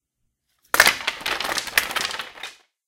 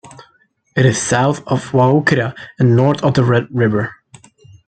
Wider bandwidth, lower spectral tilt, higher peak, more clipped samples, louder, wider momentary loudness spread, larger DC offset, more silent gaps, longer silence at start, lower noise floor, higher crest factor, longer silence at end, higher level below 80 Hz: first, 17 kHz vs 9.2 kHz; second, 0.5 dB/octave vs -6 dB/octave; about the same, 0 dBFS vs -2 dBFS; neither; second, -21 LUFS vs -15 LUFS; first, 18 LU vs 8 LU; neither; neither; about the same, 0.75 s vs 0.75 s; first, -75 dBFS vs -57 dBFS; first, 24 dB vs 14 dB; second, 0.35 s vs 0.75 s; about the same, -54 dBFS vs -50 dBFS